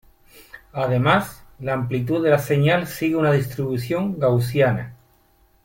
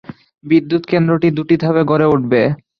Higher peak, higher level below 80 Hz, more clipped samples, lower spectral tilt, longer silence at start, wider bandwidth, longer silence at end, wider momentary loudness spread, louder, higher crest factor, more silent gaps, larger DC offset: second, -4 dBFS vs 0 dBFS; about the same, -52 dBFS vs -52 dBFS; neither; second, -7 dB/octave vs -9.5 dB/octave; first, 0.35 s vs 0.1 s; first, 17 kHz vs 5.8 kHz; first, 0.7 s vs 0.25 s; first, 10 LU vs 3 LU; second, -21 LUFS vs -14 LUFS; about the same, 18 dB vs 14 dB; neither; neither